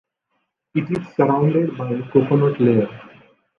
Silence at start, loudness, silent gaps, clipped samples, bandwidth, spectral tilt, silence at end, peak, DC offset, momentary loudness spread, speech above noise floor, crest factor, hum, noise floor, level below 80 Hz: 0.75 s; -19 LUFS; none; under 0.1%; 6 kHz; -10.5 dB/octave; 0.5 s; -2 dBFS; under 0.1%; 10 LU; 55 dB; 18 dB; none; -73 dBFS; -60 dBFS